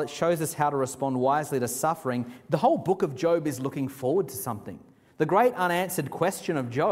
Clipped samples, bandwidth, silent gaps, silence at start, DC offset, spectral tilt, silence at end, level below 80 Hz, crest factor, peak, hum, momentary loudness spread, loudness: under 0.1%; 16 kHz; none; 0 s; under 0.1%; -5.5 dB/octave; 0 s; -66 dBFS; 18 dB; -8 dBFS; none; 8 LU; -27 LUFS